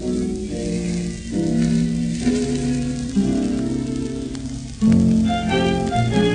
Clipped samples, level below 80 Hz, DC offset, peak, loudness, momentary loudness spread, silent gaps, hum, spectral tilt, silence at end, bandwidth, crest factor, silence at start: under 0.1%; -36 dBFS; under 0.1%; -4 dBFS; -21 LUFS; 9 LU; none; none; -6.5 dB/octave; 0 s; 10 kHz; 16 dB; 0 s